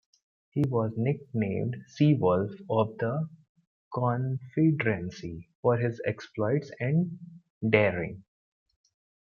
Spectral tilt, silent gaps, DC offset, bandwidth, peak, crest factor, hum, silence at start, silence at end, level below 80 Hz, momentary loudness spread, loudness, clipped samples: -8.5 dB/octave; 3.49-3.55 s, 3.67-3.91 s, 5.55-5.63 s, 7.50-7.61 s; under 0.1%; 6.8 kHz; -6 dBFS; 24 dB; none; 0.55 s; 1.05 s; -64 dBFS; 13 LU; -29 LUFS; under 0.1%